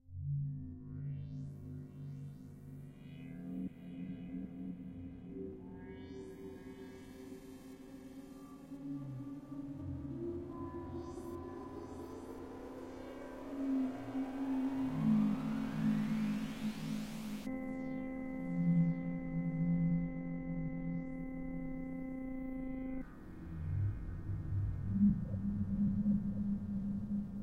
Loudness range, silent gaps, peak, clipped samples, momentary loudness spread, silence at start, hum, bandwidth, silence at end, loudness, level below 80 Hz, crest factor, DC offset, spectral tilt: 12 LU; none; -20 dBFS; under 0.1%; 17 LU; 0.05 s; none; 15 kHz; 0 s; -40 LUFS; -54 dBFS; 18 dB; under 0.1%; -8.5 dB/octave